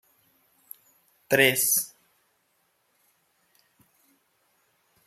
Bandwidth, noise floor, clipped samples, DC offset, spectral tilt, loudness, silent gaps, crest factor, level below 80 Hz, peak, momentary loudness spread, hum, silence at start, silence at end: 16 kHz; -71 dBFS; under 0.1%; under 0.1%; -2 dB/octave; -22 LUFS; none; 28 dB; -72 dBFS; -4 dBFS; 28 LU; none; 1.3 s; 3.2 s